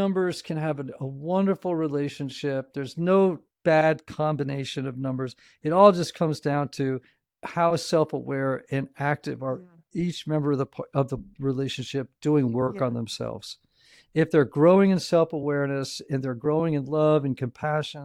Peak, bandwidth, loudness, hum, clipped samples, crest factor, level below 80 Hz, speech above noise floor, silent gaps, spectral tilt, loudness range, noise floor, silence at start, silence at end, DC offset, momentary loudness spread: -2 dBFS; 13.5 kHz; -25 LUFS; none; under 0.1%; 22 dB; -62 dBFS; 34 dB; none; -6.5 dB/octave; 5 LU; -59 dBFS; 0 s; 0 s; under 0.1%; 12 LU